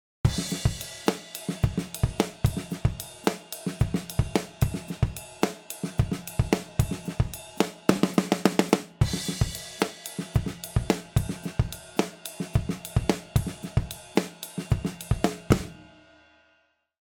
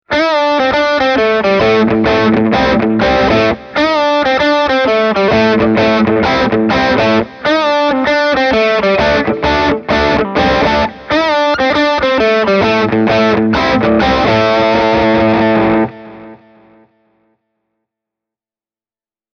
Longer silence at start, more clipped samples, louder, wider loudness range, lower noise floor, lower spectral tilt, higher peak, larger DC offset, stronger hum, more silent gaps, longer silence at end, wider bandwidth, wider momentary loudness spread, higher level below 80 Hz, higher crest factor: first, 0.25 s vs 0.1 s; neither; second, -29 LUFS vs -11 LUFS; about the same, 3 LU vs 2 LU; second, -68 dBFS vs under -90 dBFS; about the same, -5.5 dB/octave vs -6 dB/octave; about the same, -2 dBFS vs 0 dBFS; neither; neither; neither; second, 1.2 s vs 3 s; first, 19 kHz vs 6.8 kHz; first, 6 LU vs 2 LU; about the same, -38 dBFS vs -34 dBFS; first, 26 dB vs 12 dB